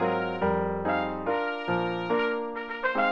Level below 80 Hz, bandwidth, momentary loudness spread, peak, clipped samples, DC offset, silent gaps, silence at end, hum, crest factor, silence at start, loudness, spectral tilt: -56 dBFS; 7 kHz; 3 LU; -12 dBFS; under 0.1%; under 0.1%; none; 0 s; none; 14 dB; 0 s; -28 LUFS; -8 dB/octave